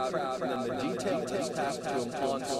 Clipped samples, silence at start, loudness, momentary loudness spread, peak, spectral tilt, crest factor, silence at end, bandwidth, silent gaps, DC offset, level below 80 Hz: under 0.1%; 0 s; -32 LUFS; 1 LU; -18 dBFS; -4.5 dB/octave; 14 dB; 0 s; 16 kHz; none; under 0.1%; -64 dBFS